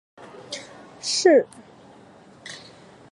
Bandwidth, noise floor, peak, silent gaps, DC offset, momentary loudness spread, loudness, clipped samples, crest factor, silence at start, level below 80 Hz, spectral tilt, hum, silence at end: 11.5 kHz; -49 dBFS; -4 dBFS; none; under 0.1%; 26 LU; -20 LUFS; under 0.1%; 22 dB; 0.2 s; -72 dBFS; -2.5 dB/octave; none; 0.55 s